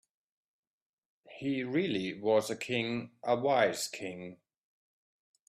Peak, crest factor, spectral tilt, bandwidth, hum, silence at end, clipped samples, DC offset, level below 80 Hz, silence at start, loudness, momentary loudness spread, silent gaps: -14 dBFS; 20 dB; -4.5 dB/octave; 15 kHz; none; 1.15 s; under 0.1%; under 0.1%; -76 dBFS; 1.3 s; -32 LUFS; 12 LU; none